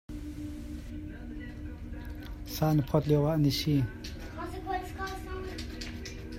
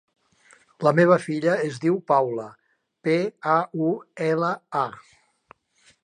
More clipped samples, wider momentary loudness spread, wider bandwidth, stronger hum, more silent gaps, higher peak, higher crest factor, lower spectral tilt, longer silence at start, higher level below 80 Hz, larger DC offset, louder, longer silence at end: neither; first, 16 LU vs 9 LU; first, 16 kHz vs 10.5 kHz; neither; neither; second, -12 dBFS vs -4 dBFS; about the same, 20 dB vs 20 dB; about the same, -6.5 dB/octave vs -7 dB/octave; second, 0.1 s vs 0.8 s; first, -44 dBFS vs -74 dBFS; neither; second, -33 LUFS vs -23 LUFS; second, 0 s vs 1.05 s